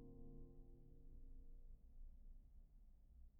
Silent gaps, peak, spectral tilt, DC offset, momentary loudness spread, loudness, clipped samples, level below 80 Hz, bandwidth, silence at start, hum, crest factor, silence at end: none; -48 dBFS; -10 dB/octave; under 0.1%; 6 LU; -67 LUFS; under 0.1%; -60 dBFS; 1.1 kHz; 0 s; none; 12 dB; 0 s